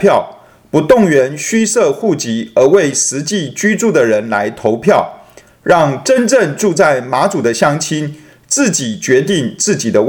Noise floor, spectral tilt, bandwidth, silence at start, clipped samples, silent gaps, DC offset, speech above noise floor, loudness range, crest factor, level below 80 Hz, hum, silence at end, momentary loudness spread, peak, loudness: -41 dBFS; -4 dB/octave; 19.5 kHz; 0 s; 0.1%; none; under 0.1%; 29 dB; 1 LU; 12 dB; -50 dBFS; none; 0 s; 7 LU; 0 dBFS; -12 LUFS